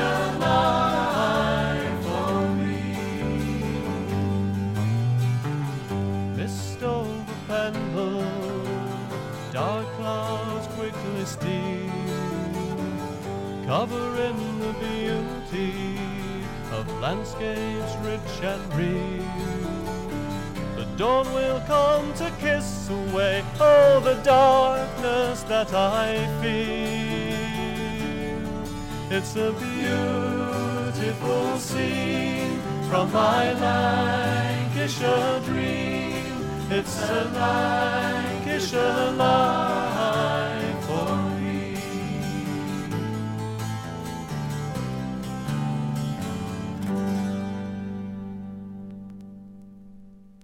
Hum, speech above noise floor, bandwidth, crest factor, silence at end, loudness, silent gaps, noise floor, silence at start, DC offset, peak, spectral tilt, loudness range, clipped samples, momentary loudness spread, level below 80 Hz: none; 24 dB; 17 kHz; 18 dB; 0.1 s; -25 LUFS; none; -47 dBFS; 0 s; under 0.1%; -6 dBFS; -6 dB/octave; 9 LU; under 0.1%; 10 LU; -44 dBFS